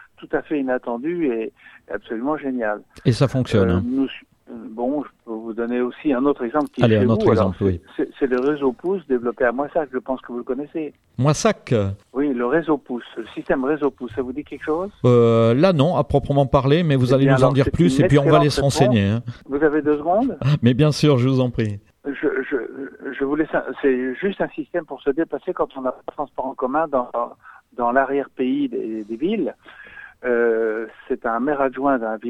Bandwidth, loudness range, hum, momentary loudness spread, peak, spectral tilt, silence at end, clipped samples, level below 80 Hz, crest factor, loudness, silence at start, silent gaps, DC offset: 12.5 kHz; 7 LU; none; 13 LU; 0 dBFS; -7 dB/octave; 0 s; under 0.1%; -46 dBFS; 20 dB; -20 LUFS; 0.2 s; none; under 0.1%